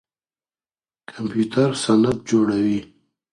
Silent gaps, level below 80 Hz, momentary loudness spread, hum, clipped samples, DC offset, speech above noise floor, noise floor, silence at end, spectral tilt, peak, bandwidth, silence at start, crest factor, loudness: none; -54 dBFS; 10 LU; none; under 0.1%; under 0.1%; over 71 dB; under -90 dBFS; 0.5 s; -6 dB/octave; -4 dBFS; 11 kHz; 1.1 s; 18 dB; -20 LUFS